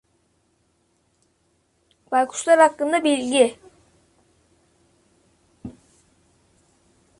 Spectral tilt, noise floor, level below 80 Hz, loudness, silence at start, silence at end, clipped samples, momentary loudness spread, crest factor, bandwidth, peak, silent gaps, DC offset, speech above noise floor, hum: -2.5 dB/octave; -66 dBFS; -64 dBFS; -19 LUFS; 2.1 s; 1.5 s; under 0.1%; 26 LU; 22 dB; 11.5 kHz; -2 dBFS; none; under 0.1%; 48 dB; none